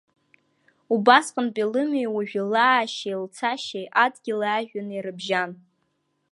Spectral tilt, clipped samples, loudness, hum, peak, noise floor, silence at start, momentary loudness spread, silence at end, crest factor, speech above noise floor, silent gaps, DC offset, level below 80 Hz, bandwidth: -4 dB/octave; under 0.1%; -23 LUFS; none; -2 dBFS; -72 dBFS; 0.9 s; 13 LU; 0.75 s; 22 dB; 49 dB; none; under 0.1%; -80 dBFS; 11.5 kHz